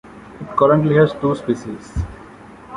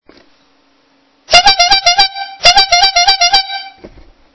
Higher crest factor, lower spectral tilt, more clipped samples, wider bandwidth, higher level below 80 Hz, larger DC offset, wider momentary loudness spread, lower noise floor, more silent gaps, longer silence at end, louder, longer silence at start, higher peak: about the same, 16 dB vs 12 dB; first, -8 dB/octave vs 0.5 dB/octave; second, under 0.1% vs 1%; first, 11 kHz vs 8 kHz; about the same, -36 dBFS vs -38 dBFS; neither; first, 15 LU vs 6 LU; second, -40 dBFS vs -53 dBFS; neither; second, 0 s vs 0.45 s; second, -18 LUFS vs -7 LUFS; second, 0.05 s vs 1.3 s; about the same, -2 dBFS vs 0 dBFS